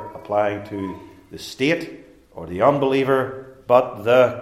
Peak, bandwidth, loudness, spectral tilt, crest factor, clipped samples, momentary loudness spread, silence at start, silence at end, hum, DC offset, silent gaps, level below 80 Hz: 0 dBFS; 14.5 kHz; -20 LUFS; -6 dB/octave; 20 dB; under 0.1%; 19 LU; 0 s; 0 s; none; under 0.1%; none; -58 dBFS